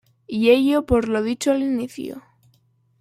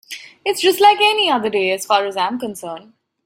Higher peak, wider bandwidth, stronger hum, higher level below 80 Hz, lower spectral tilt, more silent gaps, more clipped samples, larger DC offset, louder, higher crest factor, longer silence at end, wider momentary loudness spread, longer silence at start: second, -4 dBFS vs 0 dBFS; about the same, 15 kHz vs 16.5 kHz; neither; first, -44 dBFS vs -68 dBFS; first, -5 dB/octave vs -2 dB/octave; neither; neither; neither; second, -20 LUFS vs -16 LUFS; about the same, 18 dB vs 16 dB; first, 0.8 s vs 0.45 s; about the same, 17 LU vs 19 LU; first, 0.3 s vs 0.1 s